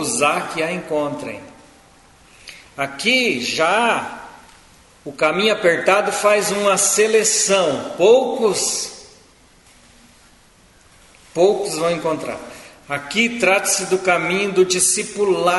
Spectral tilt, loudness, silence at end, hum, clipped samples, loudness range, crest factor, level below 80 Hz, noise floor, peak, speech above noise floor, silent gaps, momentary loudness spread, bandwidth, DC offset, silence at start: -2 dB/octave; -17 LUFS; 0 s; none; under 0.1%; 8 LU; 20 dB; -58 dBFS; -51 dBFS; 0 dBFS; 33 dB; none; 15 LU; 12 kHz; under 0.1%; 0 s